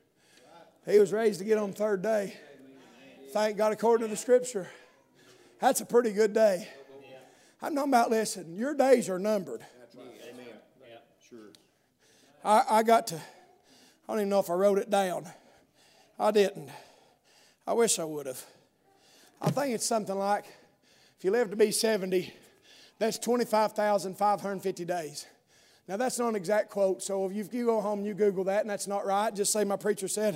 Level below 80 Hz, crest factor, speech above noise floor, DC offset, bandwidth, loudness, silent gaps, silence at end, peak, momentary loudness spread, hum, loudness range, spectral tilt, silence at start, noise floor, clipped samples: -84 dBFS; 20 dB; 39 dB; under 0.1%; 16 kHz; -28 LUFS; none; 0 s; -8 dBFS; 15 LU; none; 4 LU; -4 dB/octave; 0.55 s; -67 dBFS; under 0.1%